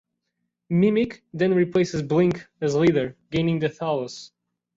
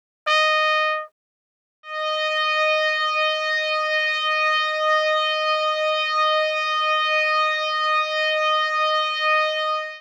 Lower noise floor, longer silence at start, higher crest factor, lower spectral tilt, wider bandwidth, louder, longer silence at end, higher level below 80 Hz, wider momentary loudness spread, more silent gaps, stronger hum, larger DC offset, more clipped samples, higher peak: second, -79 dBFS vs under -90 dBFS; first, 0.7 s vs 0.25 s; about the same, 16 dB vs 14 dB; first, -7 dB/octave vs 5.5 dB/octave; second, 7.8 kHz vs 9.8 kHz; second, -23 LUFS vs -20 LUFS; first, 0.5 s vs 0 s; first, -56 dBFS vs under -90 dBFS; first, 8 LU vs 3 LU; second, none vs 1.12-1.83 s; neither; neither; neither; about the same, -8 dBFS vs -8 dBFS